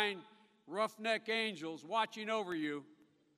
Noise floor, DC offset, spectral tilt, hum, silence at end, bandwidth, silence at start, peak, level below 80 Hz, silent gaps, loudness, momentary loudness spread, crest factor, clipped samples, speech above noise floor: -59 dBFS; under 0.1%; -3.5 dB/octave; none; 0.45 s; 15.5 kHz; 0 s; -18 dBFS; under -90 dBFS; none; -38 LUFS; 10 LU; 22 dB; under 0.1%; 21 dB